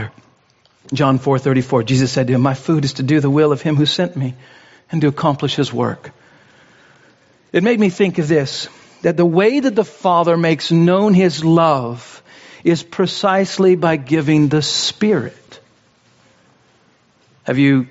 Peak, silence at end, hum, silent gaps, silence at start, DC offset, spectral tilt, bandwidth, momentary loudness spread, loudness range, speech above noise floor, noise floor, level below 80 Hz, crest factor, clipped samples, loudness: -2 dBFS; 0.05 s; none; none; 0 s; under 0.1%; -5.5 dB/octave; 8 kHz; 9 LU; 5 LU; 41 dB; -56 dBFS; -56 dBFS; 14 dB; under 0.1%; -16 LUFS